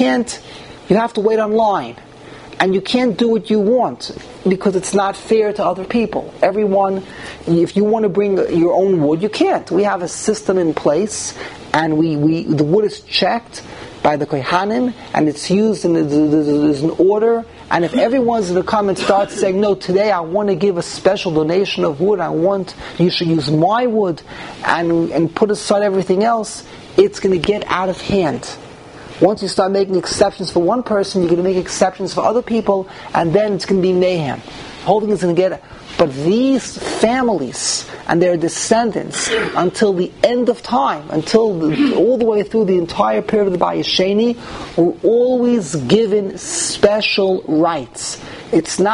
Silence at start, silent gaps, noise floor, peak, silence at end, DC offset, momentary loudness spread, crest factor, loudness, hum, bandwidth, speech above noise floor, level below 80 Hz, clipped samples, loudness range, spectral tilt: 0 s; none; -36 dBFS; 0 dBFS; 0 s; under 0.1%; 7 LU; 16 dB; -16 LUFS; none; 11 kHz; 21 dB; -48 dBFS; under 0.1%; 2 LU; -5 dB/octave